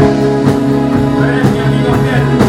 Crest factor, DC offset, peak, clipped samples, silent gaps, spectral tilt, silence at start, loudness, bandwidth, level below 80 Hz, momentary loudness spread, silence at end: 10 dB; under 0.1%; 0 dBFS; 0.2%; none; -7.5 dB/octave; 0 s; -11 LUFS; 12.5 kHz; -30 dBFS; 1 LU; 0 s